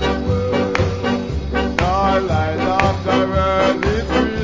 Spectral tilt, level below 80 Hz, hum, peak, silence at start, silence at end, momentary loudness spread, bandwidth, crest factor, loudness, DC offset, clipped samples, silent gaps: -6.5 dB/octave; -28 dBFS; none; 0 dBFS; 0 s; 0 s; 5 LU; 7.6 kHz; 18 dB; -18 LUFS; under 0.1%; under 0.1%; none